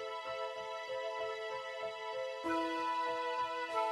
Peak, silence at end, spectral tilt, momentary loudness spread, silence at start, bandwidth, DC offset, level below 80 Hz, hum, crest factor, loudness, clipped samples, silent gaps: -24 dBFS; 0 s; -3 dB/octave; 6 LU; 0 s; 14 kHz; under 0.1%; -78 dBFS; none; 14 dB; -39 LUFS; under 0.1%; none